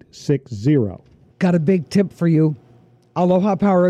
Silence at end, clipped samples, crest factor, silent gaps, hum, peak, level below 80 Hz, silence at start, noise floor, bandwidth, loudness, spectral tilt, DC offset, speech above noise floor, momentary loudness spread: 0 s; under 0.1%; 12 dB; none; none; -6 dBFS; -56 dBFS; 0.15 s; -51 dBFS; 10 kHz; -18 LUFS; -8.5 dB/octave; under 0.1%; 34 dB; 6 LU